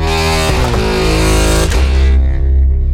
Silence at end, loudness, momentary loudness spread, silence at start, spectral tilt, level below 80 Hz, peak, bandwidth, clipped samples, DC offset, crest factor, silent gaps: 0 s; -12 LUFS; 2 LU; 0 s; -5 dB/octave; -12 dBFS; 0 dBFS; 15.5 kHz; under 0.1%; under 0.1%; 10 dB; none